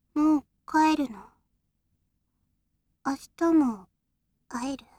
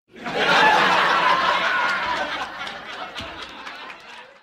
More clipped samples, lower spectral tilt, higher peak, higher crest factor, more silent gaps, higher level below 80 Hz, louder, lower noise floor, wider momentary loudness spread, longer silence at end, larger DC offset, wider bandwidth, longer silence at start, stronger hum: neither; first, -4.5 dB/octave vs -2.5 dB/octave; second, -12 dBFS vs -4 dBFS; about the same, 16 dB vs 18 dB; neither; second, -64 dBFS vs -56 dBFS; second, -27 LUFS vs -19 LUFS; first, -77 dBFS vs -42 dBFS; second, 14 LU vs 20 LU; about the same, 0.2 s vs 0.15 s; neither; second, 13.5 kHz vs 16 kHz; about the same, 0.15 s vs 0.15 s; neither